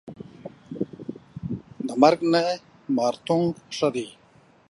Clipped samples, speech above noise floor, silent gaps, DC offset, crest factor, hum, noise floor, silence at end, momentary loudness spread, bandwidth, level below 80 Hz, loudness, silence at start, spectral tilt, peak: under 0.1%; 21 dB; none; under 0.1%; 22 dB; none; -43 dBFS; 0.6 s; 21 LU; 11.5 kHz; -60 dBFS; -24 LUFS; 0.05 s; -6 dB/octave; -4 dBFS